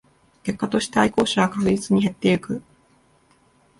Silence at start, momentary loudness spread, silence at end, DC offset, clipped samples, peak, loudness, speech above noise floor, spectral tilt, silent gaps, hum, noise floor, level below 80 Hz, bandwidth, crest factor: 0.45 s; 12 LU; 1.2 s; under 0.1%; under 0.1%; -4 dBFS; -22 LUFS; 38 dB; -5.5 dB/octave; none; none; -59 dBFS; -54 dBFS; 11.5 kHz; 18 dB